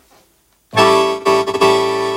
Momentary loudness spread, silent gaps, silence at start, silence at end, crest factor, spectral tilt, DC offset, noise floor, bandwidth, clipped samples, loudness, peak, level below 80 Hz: 3 LU; none; 0.75 s; 0 s; 14 dB; -4 dB/octave; under 0.1%; -56 dBFS; 16 kHz; under 0.1%; -14 LUFS; 0 dBFS; -52 dBFS